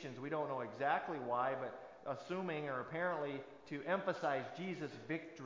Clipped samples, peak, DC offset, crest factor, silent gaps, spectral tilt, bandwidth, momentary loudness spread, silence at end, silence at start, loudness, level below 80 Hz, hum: under 0.1%; -22 dBFS; under 0.1%; 20 dB; none; -6.5 dB/octave; 7.6 kHz; 9 LU; 0 s; 0 s; -41 LUFS; -82 dBFS; none